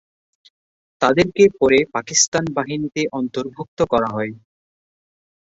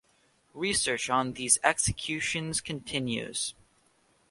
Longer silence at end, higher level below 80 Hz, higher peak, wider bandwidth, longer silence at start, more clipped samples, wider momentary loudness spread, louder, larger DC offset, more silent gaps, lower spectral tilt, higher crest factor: first, 1.05 s vs 0.8 s; about the same, -52 dBFS vs -54 dBFS; first, -2 dBFS vs -6 dBFS; second, 8 kHz vs 11.5 kHz; first, 1 s vs 0.55 s; neither; about the same, 11 LU vs 10 LU; first, -18 LUFS vs -28 LUFS; neither; first, 2.28-2.32 s, 3.68-3.77 s vs none; first, -3.5 dB/octave vs -2 dB/octave; second, 18 dB vs 26 dB